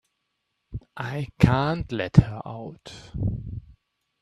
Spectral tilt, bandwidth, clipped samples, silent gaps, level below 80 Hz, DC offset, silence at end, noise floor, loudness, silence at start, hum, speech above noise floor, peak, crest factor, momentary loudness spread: -8 dB/octave; 10.5 kHz; under 0.1%; none; -40 dBFS; under 0.1%; 0.6 s; -78 dBFS; -24 LUFS; 0.7 s; none; 54 dB; 0 dBFS; 26 dB; 21 LU